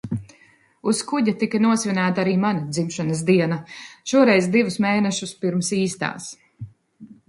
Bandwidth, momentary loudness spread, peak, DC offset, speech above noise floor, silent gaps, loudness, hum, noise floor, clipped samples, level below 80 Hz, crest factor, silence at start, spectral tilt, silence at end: 11.5 kHz; 17 LU; -2 dBFS; under 0.1%; 35 dB; none; -21 LUFS; none; -56 dBFS; under 0.1%; -60 dBFS; 18 dB; 0.05 s; -5 dB/octave; 0.15 s